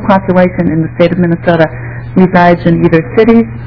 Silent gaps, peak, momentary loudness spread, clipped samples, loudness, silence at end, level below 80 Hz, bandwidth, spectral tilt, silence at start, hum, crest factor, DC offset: none; 0 dBFS; 6 LU; 5%; -9 LUFS; 0 s; -32 dBFS; 5.4 kHz; -10 dB/octave; 0 s; none; 8 dB; 0.9%